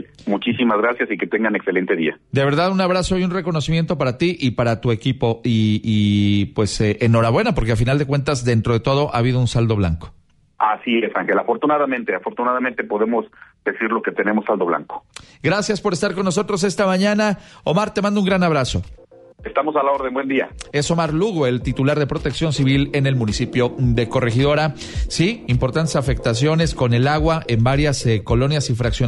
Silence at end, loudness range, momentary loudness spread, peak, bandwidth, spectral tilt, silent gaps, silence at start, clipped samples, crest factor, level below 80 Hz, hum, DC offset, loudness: 0 s; 3 LU; 5 LU; -4 dBFS; 11.5 kHz; -6 dB/octave; none; 0.2 s; under 0.1%; 14 dB; -36 dBFS; none; under 0.1%; -19 LUFS